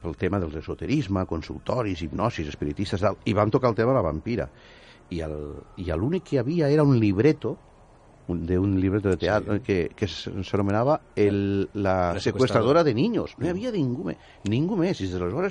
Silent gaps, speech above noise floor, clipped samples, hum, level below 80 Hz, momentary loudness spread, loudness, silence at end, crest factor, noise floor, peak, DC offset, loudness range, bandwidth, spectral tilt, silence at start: none; 28 dB; under 0.1%; none; -46 dBFS; 12 LU; -25 LUFS; 0 s; 18 dB; -52 dBFS; -6 dBFS; under 0.1%; 3 LU; 10.5 kHz; -7.5 dB/octave; 0 s